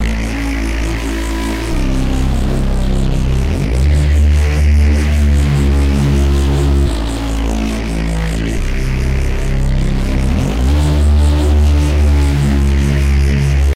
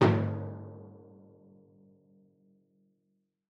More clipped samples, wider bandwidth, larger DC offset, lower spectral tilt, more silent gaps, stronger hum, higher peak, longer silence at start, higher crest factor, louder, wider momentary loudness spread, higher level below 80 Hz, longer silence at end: neither; first, 12.5 kHz vs 7 kHz; first, 1% vs under 0.1%; second, -6.5 dB/octave vs -8.5 dB/octave; neither; neither; first, -4 dBFS vs -12 dBFS; about the same, 0 s vs 0 s; second, 8 dB vs 24 dB; first, -15 LUFS vs -33 LUFS; second, 6 LU vs 28 LU; first, -14 dBFS vs -70 dBFS; second, 0 s vs 2.55 s